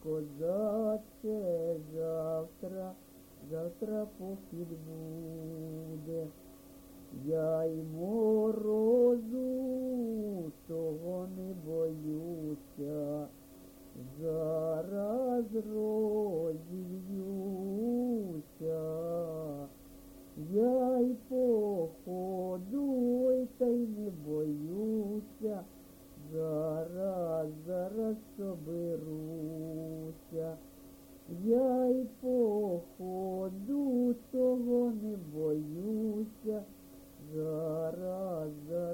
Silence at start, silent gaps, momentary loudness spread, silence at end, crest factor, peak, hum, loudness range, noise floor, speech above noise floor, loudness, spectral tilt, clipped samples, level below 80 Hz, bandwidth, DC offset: 0 s; none; 14 LU; 0 s; 16 dB; -18 dBFS; none; 8 LU; -56 dBFS; 22 dB; -35 LUFS; -8.5 dB/octave; under 0.1%; -64 dBFS; 17 kHz; under 0.1%